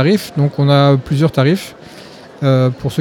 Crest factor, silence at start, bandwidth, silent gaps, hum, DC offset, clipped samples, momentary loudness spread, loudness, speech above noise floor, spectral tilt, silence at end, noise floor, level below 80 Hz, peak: 14 dB; 0 s; 16.5 kHz; none; none; under 0.1%; under 0.1%; 8 LU; -14 LUFS; 23 dB; -7.5 dB/octave; 0 s; -36 dBFS; -48 dBFS; 0 dBFS